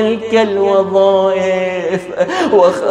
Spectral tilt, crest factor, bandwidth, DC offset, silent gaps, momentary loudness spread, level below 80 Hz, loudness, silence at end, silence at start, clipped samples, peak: -5.5 dB/octave; 12 dB; 11 kHz; under 0.1%; none; 7 LU; -56 dBFS; -13 LUFS; 0 s; 0 s; under 0.1%; 0 dBFS